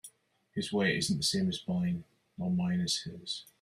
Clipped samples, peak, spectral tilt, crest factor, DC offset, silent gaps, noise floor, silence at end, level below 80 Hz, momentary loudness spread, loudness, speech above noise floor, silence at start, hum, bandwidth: under 0.1%; -16 dBFS; -4.5 dB/octave; 16 dB; under 0.1%; none; -63 dBFS; 0.2 s; -66 dBFS; 10 LU; -32 LUFS; 31 dB; 0.05 s; none; 14 kHz